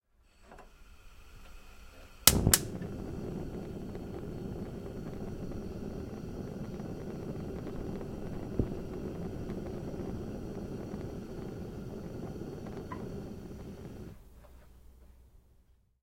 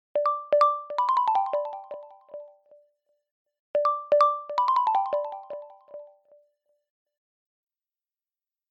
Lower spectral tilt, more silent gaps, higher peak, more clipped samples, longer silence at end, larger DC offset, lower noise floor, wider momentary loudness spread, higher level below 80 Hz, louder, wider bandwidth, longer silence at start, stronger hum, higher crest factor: about the same, -3.5 dB/octave vs -3 dB/octave; second, none vs 3.31-3.45 s, 3.59-3.74 s; first, 0 dBFS vs -10 dBFS; neither; second, 0.4 s vs 2.65 s; neither; second, -65 dBFS vs under -90 dBFS; second, 16 LU vs 23 LU; first, -48 dBFS vs -90 dBFS; second, -36 LUFS vs -25 LUFS; first, 16.5 kHz vs 8.4 kHz; first, 0.35 s vs 0.15 s; neither; first, 38 dB vs 18 dB